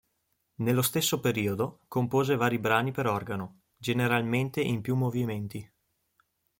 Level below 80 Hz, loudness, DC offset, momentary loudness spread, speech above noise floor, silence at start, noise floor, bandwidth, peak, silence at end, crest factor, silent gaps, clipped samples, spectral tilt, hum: -64 dBFS; -28 LUFS; under 0.1%; 11 LU; 49 dB; 0.6 s; -77 dBFS; 17 kHz; -10 dBFS; 0.95 s; 20 dB; none; under 0.1%; -5 dB/octave; none